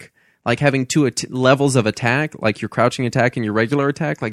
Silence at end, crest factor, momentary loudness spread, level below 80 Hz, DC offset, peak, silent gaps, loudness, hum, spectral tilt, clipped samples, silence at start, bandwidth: 0 s; 18 dB; 6 LU; -54 dBFS; under 0.1%; 0 dBFS; none; -18 LUFS; none; -5.5 dB/octave; under 0.1%; 0 s; 13 kHz